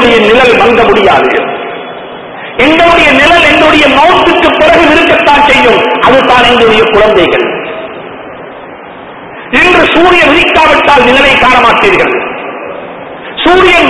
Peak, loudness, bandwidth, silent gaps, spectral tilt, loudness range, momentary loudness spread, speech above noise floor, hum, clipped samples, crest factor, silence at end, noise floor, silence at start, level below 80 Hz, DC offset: 0 dBFS; -4 LUFS; 11 kHz; none; -4 dB/octave; 5 LU; 19 LU; 21 dB; none; 6%; 6 dB; 0 s; -25 dBFS; 0 s; -30 dBFS; 1%